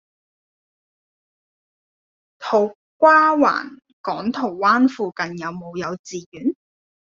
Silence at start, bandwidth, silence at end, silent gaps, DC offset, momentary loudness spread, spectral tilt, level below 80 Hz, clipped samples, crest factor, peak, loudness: 2.4 s; 7.6 kHz; 0.55 s; 2.75-3.00 s, 3.93-4.04 s, 5.99-6.04 s, 6.26-6.32 s; under 0.1%; 18 LU; -3.5 dB/octave; -66 dBFS; under 0.1%; 20 dB; -2 dBFS; -19 LUFS